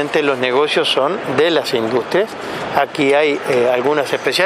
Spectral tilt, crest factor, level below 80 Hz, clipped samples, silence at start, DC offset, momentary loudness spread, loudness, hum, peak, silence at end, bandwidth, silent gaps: -4 dB/octave; 16 dB; -60 dBFS; under 0.1%; 0 s; under 0.1%; 4 LU; -16 LUFS; none; 0 dBFS; 0 s; 15.5 kHz; none